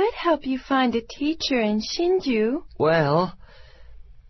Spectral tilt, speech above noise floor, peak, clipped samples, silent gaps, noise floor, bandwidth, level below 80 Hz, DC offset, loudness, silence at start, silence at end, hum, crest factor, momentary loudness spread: -5.5 dB/octave; 23 dB; -6 dBFS; under 0.1%; none; -45 dBFS; 6.2 kHz; -48 dBFS; under 0.1%; -23 LUFS; 0 s; 0.1 s; none; 16 dB; 5 LU